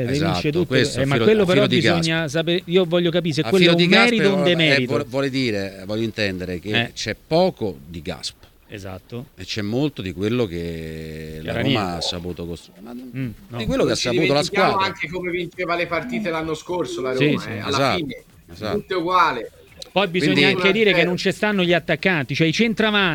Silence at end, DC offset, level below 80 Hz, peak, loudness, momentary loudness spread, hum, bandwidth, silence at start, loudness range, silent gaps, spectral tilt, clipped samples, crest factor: 0 s; under 0.1%; -48 dBFS; 0 dBFS; -20 LUFS; 16 LU; none; 18.5 kHz; 0 s; 9 LU; none; -5 dB/octave; under 0.1%; 20 dB